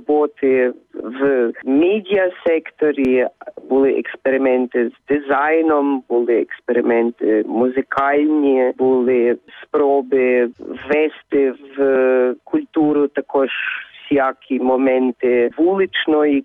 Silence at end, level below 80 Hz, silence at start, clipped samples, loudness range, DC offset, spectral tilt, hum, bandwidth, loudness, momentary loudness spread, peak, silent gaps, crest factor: 0 s; -60 dBFS; 0.1 s; under 0.1%; 1 LU; under 0.1%; -8 dB/octave; none; 3.9 kHz; -17 LUFS; 6 LU; -6 dBFS; none; 12 dB